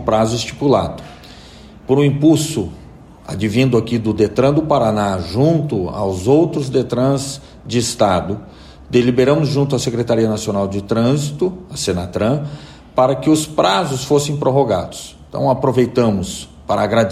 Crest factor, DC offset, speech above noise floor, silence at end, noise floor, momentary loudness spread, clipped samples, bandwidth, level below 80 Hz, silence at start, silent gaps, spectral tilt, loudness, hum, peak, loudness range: 14 dB; under 0.1%; 23 dB; 0 s; -39 dBFS; 12 LU; under 0.1%; 14.5 kHz; -42 dBFS; 0 s; none; -6 dB/octave; -16 LUFS; none; -2 dBFS; 2 LU